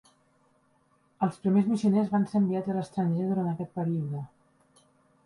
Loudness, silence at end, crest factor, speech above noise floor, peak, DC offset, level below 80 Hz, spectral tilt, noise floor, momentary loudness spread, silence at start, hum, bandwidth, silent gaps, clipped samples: -28 LUFS; 1 s; 16 dB; 40 dB; -14 dBFS; under 0.1%; -70 dBFS; -9 dB/octave; -67 dBFS; 7 LU; 1.2 s; none; 11 kHz; none; under 0.1%